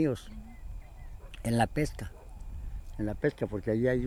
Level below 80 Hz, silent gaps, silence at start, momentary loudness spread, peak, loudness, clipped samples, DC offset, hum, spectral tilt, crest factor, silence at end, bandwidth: -42 dBFS; none; 0 s; 20 LU; -12 dBFS; -33 LUFS; under 0.1%; under 0.1%; none; -7 dB/octave; 20 dB; 0 s; 16 kHz